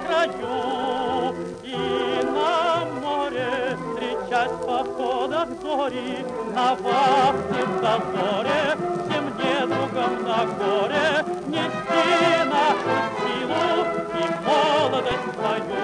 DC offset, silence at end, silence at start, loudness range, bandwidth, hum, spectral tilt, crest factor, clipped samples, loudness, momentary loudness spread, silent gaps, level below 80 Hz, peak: under 0.1%; 0 s; 0 s; 3 LU; 10.5 kHz; none; -5 dB/octave; 14 dB; under 0.1%; -23 LUFS; 7 LU; none; -58 dBFS; -8 dBFS